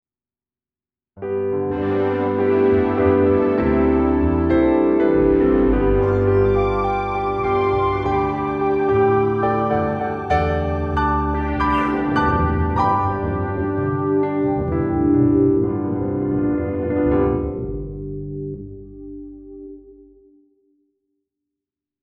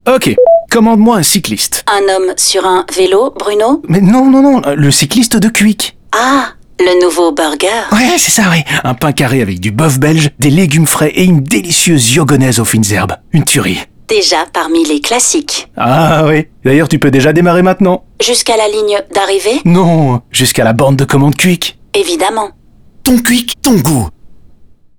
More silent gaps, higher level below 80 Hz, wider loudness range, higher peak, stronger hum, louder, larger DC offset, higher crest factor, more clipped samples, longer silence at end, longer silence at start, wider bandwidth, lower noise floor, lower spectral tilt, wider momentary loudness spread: neither; first, -32 dBFS vs -38 dBFS; first, 8 LU vs 2 LU; second, -4 dBFS vs 0 dBFS; neither; second, -19 LUFS vs -9 LUFS; neither; first, 16 dB vs 10 dB; neither; first, 2.1 s vs 0.45 s; first, 1.15 s vs 0.05 s; second, 6.2 kHz vs over 20 kHz; first, under -90 dBFS vs -39 dBFS; first, -9.5 dB/octave vs -4.5 dB/octave; first, 13 LU vs 6 LU